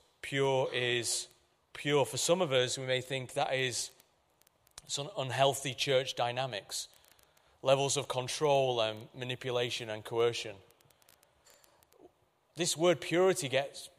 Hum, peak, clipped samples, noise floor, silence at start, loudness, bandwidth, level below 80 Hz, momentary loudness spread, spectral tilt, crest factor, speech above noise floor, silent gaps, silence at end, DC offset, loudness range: none; -14 dBFS; under 0.1%; -70 dBFS; 0.25 s; -32 LUFS; 15.5 kHz; -74 dBFS; 11 LU; -3.5 dB/octave; 20 dB; 38 dB; none; 0.1 s; under 0.1%; 5 LU